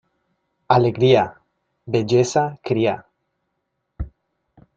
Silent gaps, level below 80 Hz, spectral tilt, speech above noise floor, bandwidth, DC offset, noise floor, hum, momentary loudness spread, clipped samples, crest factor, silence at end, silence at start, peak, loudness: none; -44 dBFS; -6 dB/octave; 58 dB; 7.8 kHz; under 0.1%; -75 dBFS; none; 19 LU; under 0.1%; 20 dB; 0.7 s; 0.7 s; -2 dBFS; -19 LUFS